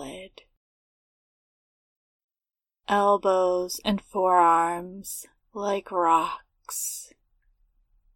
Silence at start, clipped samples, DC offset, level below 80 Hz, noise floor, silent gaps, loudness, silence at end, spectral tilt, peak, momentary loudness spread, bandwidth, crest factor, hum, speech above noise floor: 0 s; under 0.1%; under 0.1%; -62 dBFS; under -90 dBFS; 0.57-2.28 s; -24 LUFS; 1.1 s; -3.5 dB/octave; -8 dBFS; 18 LU; 17.5 kHz; 20 dB; none; over 66 dB